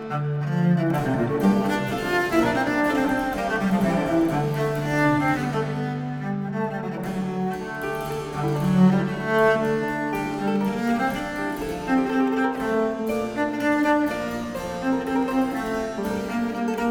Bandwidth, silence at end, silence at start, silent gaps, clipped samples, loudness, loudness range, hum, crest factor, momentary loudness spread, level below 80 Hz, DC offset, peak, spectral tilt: 19 kHz; 0 s; 0 s; none; under 0.1%; -24 LUFS; 3 LU; none; 16 dB; 8 LU; -48 dBFS; under 0.1%; -6 dBFS; -7 dB/octave